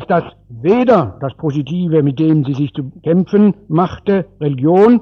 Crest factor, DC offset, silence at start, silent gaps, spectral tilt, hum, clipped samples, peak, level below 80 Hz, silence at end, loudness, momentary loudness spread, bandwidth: 14 dB; under 0.1%; 0 s; none; -10 dB/octave; none; under 0.1%; 0 dBFS; -48 dBFS; 0 s; -15 LUFS; 10 LU; 6.6 kHz